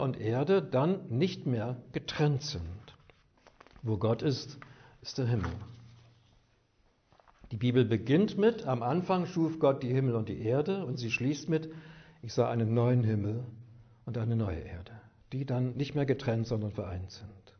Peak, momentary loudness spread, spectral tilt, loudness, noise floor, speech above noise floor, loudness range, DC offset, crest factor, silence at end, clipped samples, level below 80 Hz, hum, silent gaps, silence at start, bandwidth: -12 dBFS; 18 LU; -7.5 dB/octave; -31 LUFS; -69 dBFS; 39 dB; 6 LU; under 0.1%; 20 dB; 0.1 s; under 0.1%; -58 dBFS; none; none; 0 s; 6.6 kHz